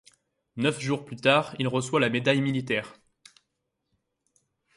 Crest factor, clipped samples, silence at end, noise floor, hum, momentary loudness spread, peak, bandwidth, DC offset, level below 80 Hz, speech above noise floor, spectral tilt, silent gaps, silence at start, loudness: 22 dB; under 0.1%; 1.85 s; -80 dBFS; none; 8 LU; -6 dBFS; 11.5 kHz; under 0.1%; -68 dBFS; 55 dB; -5 dB/octave; none; 0.55 s; -26 LUFS